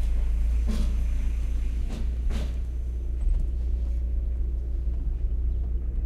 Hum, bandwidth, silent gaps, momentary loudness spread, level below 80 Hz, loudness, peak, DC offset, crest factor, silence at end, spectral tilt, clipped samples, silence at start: none; 7.2 kHz; none; 4 LU; -26 dBFS; -30 LUFS; -14 dBFS; under 0.1%; 10 dB; 0 s; -7.5 dB/octave; under 0.1%; 0 s